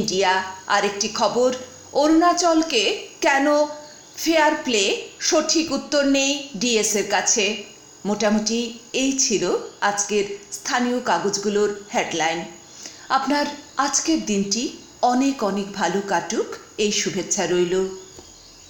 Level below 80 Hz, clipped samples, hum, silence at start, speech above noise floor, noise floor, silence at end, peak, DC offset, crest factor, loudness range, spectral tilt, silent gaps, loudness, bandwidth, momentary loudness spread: -56 dBFS; under 0.1%; none; 0 s; 24 dB; -45 dBFS; 0.2 s; -4 dBFS; under 0.1%; 18 dB; 3 LU; -2.5 dB/octave; none; -21 LUFS; 17 kHz; 10 LU